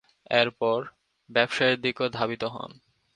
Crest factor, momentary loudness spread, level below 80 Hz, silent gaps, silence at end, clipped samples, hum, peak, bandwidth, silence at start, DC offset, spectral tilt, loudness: 24 dB; 14 LU; -66 dBFS; none; 0.45 s; under 0.1%; none; -4 dBFS; 10.5 kHz; 0.3 s; under 0.1%; -4.5 dB/octave; -26 LUFS